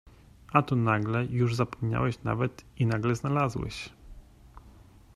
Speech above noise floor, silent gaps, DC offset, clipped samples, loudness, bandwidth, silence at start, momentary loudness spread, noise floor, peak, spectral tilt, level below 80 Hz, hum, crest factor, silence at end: 26 dB; none; under 0.1%; under 0.1%; -28 LUFS; 12 kHz; 0.5 s; 8 LU; -53 dBFS; -6 dBFS; -7.5 dB/octave; -52 dBFS; none; 24 dB; 0.45 s